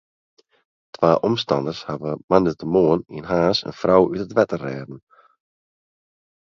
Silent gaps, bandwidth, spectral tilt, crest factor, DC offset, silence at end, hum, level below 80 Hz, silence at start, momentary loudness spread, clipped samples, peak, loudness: 2.24-2.28 s; 7.2 kHz; -7 dB/octave; 22 dB; under 0.1%; 1.5 s; none; -52 dBFS; 1 s; 11 LU; under 0.1%; 0 dBFS; -20 LUFS